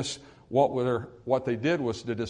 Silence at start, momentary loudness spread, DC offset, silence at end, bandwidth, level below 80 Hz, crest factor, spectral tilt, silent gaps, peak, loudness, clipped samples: 0 s; 8 LU; under 0.1%; 0 s; 10.5 kHz; -62 dBFS; 18 dB; -5.5 dB/octave; none; -10 dBFS; -28 LUFS; under 0.1%